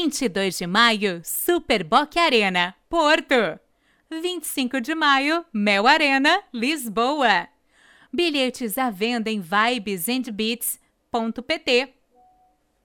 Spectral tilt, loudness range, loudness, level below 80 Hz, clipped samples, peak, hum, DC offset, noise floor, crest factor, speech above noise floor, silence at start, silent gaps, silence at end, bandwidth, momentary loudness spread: -3 dB/octave; 4 LU; -21 LUFS; -58 dBFS; under 0.1%; -2 dBFS; none; under 0.1%; -63 dBFS; 20 dB; 41 dB; 0 s; none; 1 s; 19.5 kHz; 10 LU